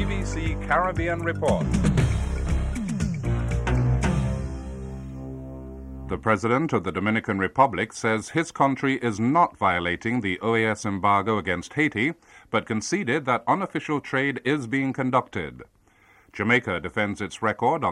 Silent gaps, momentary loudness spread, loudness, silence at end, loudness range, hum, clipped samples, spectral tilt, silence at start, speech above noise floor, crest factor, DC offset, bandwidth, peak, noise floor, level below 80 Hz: none; 12 LU; -24 LUFS; 0 s; 4 LU; none; under 0.1%; -6 dB/octave; 0 s; 33 dB; 18 dB; under 0.1%; 11.5 kHz; -6 dBFS; -57 dBFS; -36 dBFS